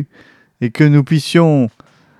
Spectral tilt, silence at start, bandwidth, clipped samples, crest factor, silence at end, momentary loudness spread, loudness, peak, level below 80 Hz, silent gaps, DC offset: -7 dB/octave; 0 s; 12.5 kHz; under 0.1%; 14 dB; 0.5 s; 12 LU; -13 LUFS; 0 dBFS; -64 dBFS; none; under 0.1%